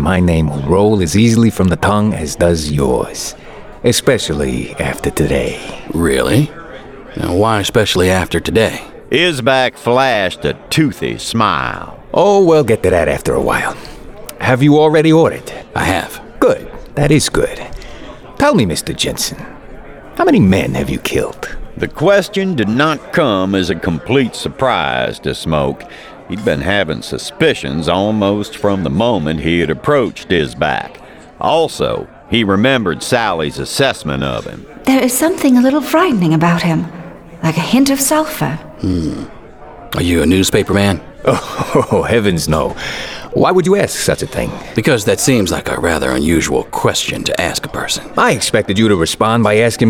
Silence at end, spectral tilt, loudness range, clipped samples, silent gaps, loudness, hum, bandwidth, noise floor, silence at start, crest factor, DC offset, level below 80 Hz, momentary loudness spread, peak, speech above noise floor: 0 s; -5 dB/octave; 3 LU; under 0.1%; none; -14 LUFS; none; 19.5 kHz; -34 dBFS; 0 s; 14 dB; under 0.1%; -34 dBFS; 12 LU; 0 dBFS; 20 dB